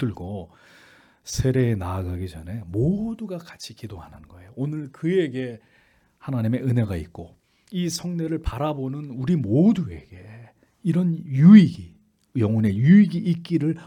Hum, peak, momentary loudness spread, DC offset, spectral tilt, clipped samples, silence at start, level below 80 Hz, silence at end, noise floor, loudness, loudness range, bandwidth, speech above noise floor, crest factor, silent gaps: none; -2 dBFS; 21 LU; under 0.1%; -7.5 dB/octave; under 0.1%; 0 s; -46 dBFS; 0 s; -59 dBFS; -22 LUFS; 11 LU; 13 kHz; 38 dB; 20 dB; none